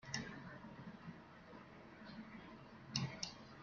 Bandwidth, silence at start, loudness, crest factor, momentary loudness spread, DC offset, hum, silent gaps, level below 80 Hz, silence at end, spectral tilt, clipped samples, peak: 7.2 kHz; 0 s; -50 LUFS; 30 dB; 14 LU; under 0.1%; none; none; -74 dBFS; 0 s; -3.5 dB/octave; under 0.1%; -22 dBFS